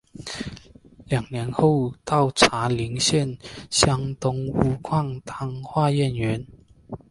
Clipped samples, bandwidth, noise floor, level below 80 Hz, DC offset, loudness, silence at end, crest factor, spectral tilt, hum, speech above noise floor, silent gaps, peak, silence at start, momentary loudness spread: under 0.1%; 11.5 kHz; -49 dBFS; -46 dBFS; under 0.1%; -23 LUFS; 0.15 s; 24 dB; -4.5 dB/octave; none; 26 dB; none; 0 dBFS; 0.15 s; 14 LU